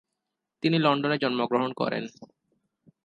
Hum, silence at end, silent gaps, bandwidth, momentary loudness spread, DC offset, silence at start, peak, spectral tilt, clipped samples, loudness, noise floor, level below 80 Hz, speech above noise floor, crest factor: none; 0.8 s; none; 9.2 kHz; 8 LU; under 0.1%; 0.65 s; -8 dBFS; -7 dB/octave; under 0.1%; -26 LUFS; -84 dBFS; -74 dBFS; 58 dB; 20 dB